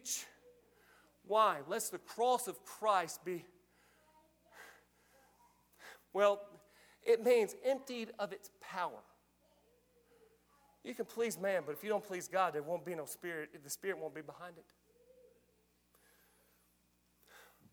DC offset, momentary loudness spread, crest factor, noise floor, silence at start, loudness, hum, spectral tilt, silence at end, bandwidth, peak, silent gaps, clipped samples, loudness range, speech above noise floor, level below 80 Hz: under 0.1%; 22 LU; 22 dB; -75 dBFS; 0.05 s; -37 LUFS; 60 Hz at -75 dBFS; -3 dB/octave; 0.3 s; 20 kHz; -18 dBFS; none; under 0.1%; 11 LU; 38 dB; -82 dBFS